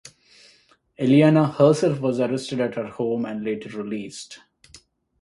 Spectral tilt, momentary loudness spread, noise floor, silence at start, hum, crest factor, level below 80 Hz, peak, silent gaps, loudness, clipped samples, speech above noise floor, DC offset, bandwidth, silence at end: -7 dB/octave; 15 LU; -58 dBFS; 0.05 s; none; 20 dB; -62 dBFS; -4 dBFS; none; -21 LUFS; under 0.1%; 37 dB; under 0.1%; 11.5 kHz; 0.45 s